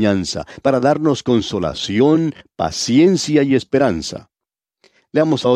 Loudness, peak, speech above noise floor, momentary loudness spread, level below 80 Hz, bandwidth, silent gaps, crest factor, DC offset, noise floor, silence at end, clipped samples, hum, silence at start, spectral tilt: -17 LUFS; -2 dBFS; 71 dB; 10 LU; -48 dBFS; 11.5 kHz; none; 14 dB; under 0.1%; -87 dBFS; 0 s; under 0.1%; none; 0 s; -5.5 dB/octave